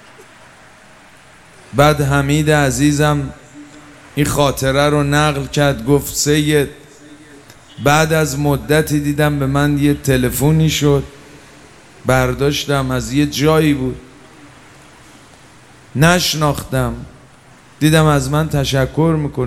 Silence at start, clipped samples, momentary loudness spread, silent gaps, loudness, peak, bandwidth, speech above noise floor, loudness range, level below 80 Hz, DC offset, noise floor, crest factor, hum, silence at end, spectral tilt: 0.2 s; under 0.1%; 7 LU; none; -15 LUFS; 0 dBFS; 16 kHz; 30 dB; 4 LU; -36 dBFS; 0.5%; -44 dBFS; 16 dB; none; 0 s; -5 dB/octave